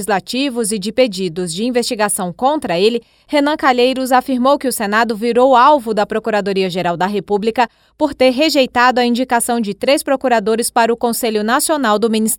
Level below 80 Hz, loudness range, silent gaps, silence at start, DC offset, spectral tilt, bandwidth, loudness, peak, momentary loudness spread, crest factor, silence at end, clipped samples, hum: -52 dBFS; 3 LU; none; 0 s; under 0.1%; -3.5 dB/octave; 18.5 kHz; -15 LUFS; 0 dBFS; 6 LU; 14 dB; 0 s; under 0.1%; none